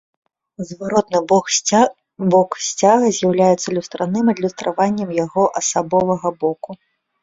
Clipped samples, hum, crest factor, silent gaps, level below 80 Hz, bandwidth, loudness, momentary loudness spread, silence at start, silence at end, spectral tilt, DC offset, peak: under 0.1%; none; 16 dB; none; -58 dBFS; 7.8 kHz; -17 LUFS; 9 LU; 0.6 s; 0.5 s; -4.5 dB/octave; under 0.1%; -2 dBFS